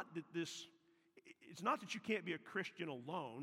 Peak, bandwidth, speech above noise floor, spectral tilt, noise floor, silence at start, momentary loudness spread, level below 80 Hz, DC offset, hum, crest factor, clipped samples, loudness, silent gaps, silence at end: -24 dBFS; 16 kHz; 26 dB; -4.5 dB/octave; -71 dBFS; 0 s; 17 LU; under -90 dBFS; under 0.1%; none; 22 dB; under 0.1%; -44 LUFS; none; 0 s